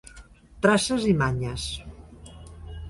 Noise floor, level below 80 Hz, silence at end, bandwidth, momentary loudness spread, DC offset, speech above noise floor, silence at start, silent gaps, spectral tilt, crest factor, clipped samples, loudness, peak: -49 dBFS; -44 dBFS; 0 s; 11.5 kHz; 24 LU; under 0.1%; 26 dB; 0.05 s; none; -5 dB/octave; 22 dB; under 0.1%; -24 LUFS; -6 dBFS